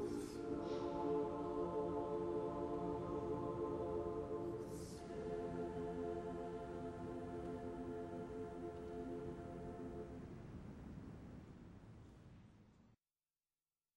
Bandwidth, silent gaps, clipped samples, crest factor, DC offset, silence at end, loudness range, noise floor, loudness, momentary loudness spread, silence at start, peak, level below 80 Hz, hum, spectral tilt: 13 kHz; none; under 0.1%; 16 dB; under 0.1%; 1.1 s; 12 LU; under -90 dBFS; -46 LUFS; 14 LU; 0 s; -30 dBFS; -62 dBFS; none; -7.5 dB/octave